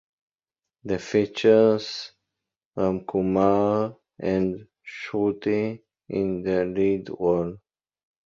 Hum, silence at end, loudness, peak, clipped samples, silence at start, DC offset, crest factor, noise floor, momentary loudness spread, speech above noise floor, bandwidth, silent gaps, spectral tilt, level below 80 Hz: none; 0.7 s; -24 LUFS; -6 dBFS; under 0.1%; 0.85 s; under 0.1%; 18 dB; -90 dBFS; 16 LU; 66 dB; 7.4 kHz; 2.66-2.71 s; -7 dB/octave; -56 dBFS